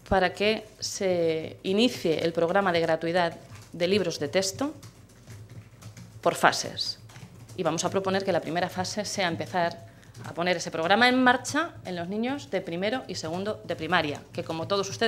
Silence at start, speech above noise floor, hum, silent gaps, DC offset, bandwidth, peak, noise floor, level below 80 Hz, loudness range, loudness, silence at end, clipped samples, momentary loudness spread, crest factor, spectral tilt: 0.05 s; 21 dB; none; none; under 0.1%; 15.5 kHz; -2 dBFS; -48 dBFS; -58 dBFS; 4 LU; -27 LUFS; 0 s; under 0.1%; 20 LU; 24 dB; -4 dB/octave